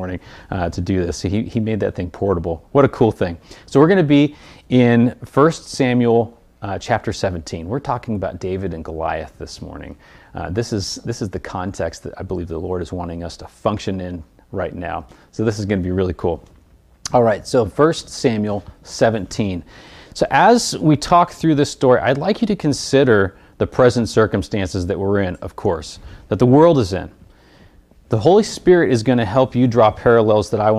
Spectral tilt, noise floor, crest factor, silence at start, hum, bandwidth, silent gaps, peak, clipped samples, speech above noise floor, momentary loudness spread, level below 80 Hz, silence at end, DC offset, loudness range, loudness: -6 dB/octave; -50 dBFS; 16 dB; 0 s; none; 13.5 kHz; none; 0 dBFS; under 0.1%; 33 dB; 15 LU; -44 dBFS; 0 s; under 0.1%; 10 LU; -18 LUFS